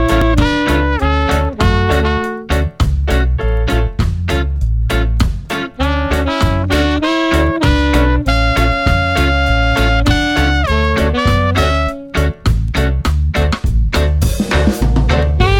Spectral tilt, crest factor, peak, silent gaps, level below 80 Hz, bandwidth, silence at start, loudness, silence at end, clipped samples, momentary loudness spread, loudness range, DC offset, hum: -6 dB/octave; 12 dB; 0 dBFS; none; -16 dBFS; 16.5 kHz; 0 s; -14 LUFS; 0 s; under 0.1%; 5 LU; 3 LU; under 0.1%; none